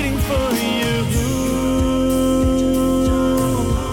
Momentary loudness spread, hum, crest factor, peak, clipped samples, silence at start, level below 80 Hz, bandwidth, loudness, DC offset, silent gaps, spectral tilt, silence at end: 3 LU; none; 10 dB; -8 dBFS; under 0.1%; 0 s; -26 dBFS; 18 kHz; -18 LUFS; under 0.1%; none; -5.5 dB/octave; 0 s